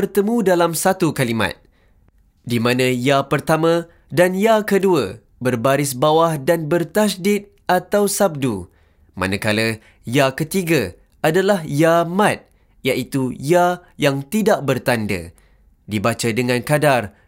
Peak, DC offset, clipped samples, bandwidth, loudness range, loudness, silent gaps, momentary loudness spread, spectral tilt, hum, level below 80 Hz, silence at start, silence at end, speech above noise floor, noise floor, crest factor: -2 dBFS; under 0.1%; under 0.1%; 16 kHz; 3 LU; -18 LUFS; none; 8 LU; -5 dB/octave; none; -52 dBFS; 0 s; 0.2 s; 38 dB; -55 dBFS; 16 dB